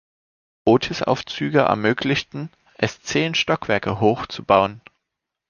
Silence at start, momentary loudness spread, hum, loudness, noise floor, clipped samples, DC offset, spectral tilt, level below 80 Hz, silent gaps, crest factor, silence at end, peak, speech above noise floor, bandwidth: 0.65 s; 8 LU; none; -20 LUFS; -82 dBFS; under 0.1%; under 0.1%; -5 dB/octave; -52 dBFS; none; 20 dB; 0.7 s; -2 dBFS; 62 dB; 7.2 kHz